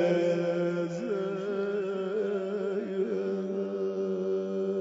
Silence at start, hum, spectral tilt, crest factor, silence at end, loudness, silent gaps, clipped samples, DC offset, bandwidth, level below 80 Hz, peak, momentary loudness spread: 0 s; none; -7.5 dB/octave; 14 dB; 0 s; -31 LUFS; none; under 0.1%; under 0.1%; 7.8 kHz; -80 dBFS; -16 dBFS; 4 LU